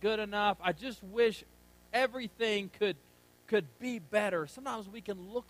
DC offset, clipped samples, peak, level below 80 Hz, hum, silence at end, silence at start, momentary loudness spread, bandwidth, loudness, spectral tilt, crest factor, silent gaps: under 0.1%; under 0.1%; -16 dBFS; -66 dBFS; 60 Hz at -65 dBFS; 0.1 s; 0 s; 10 LU; 15.5 kHz; -34 LUFS; -4.5 dB/octave; 18 dB; none